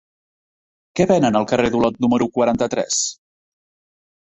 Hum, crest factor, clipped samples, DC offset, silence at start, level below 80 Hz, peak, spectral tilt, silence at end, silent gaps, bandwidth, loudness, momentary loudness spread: none; 18 dB; under 0.1%; under 0.1%; 0.95 s; -50 dBFS; -2 dBFS; -4.5 dB/octave; 1.1 s; none; 8.4 kHz; -18 LUFS; 5 LU